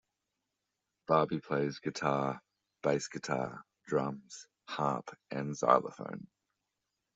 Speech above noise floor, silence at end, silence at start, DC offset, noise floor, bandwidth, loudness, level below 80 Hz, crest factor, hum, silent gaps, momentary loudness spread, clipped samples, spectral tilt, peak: 53 dB; 0.95 s; 1.1 s; under 0.1%; -87 dBFS; 8.2 kHz; -34 LUFS; -74 dBFS; 26 dB; none; none; 17 LU; under 0.1%; -5.5 dB/octave; -10 dBFS